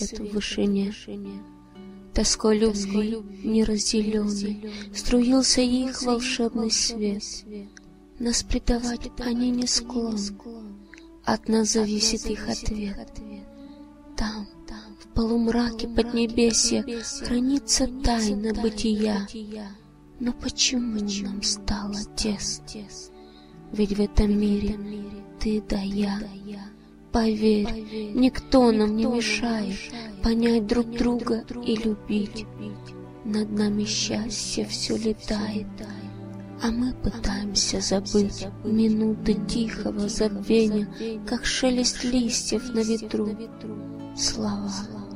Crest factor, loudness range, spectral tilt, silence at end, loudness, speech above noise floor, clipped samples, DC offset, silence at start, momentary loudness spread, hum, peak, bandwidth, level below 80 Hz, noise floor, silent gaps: 20 dB; 4 LU; -4 dB/octave; 0 s; -25 LUFS; 22 dB; under 0.1%; under 0.1%; 0 s; 16 LU; none; -6 dBFS; 14.5 kHz; -38 dBFS; -46 dBFS; none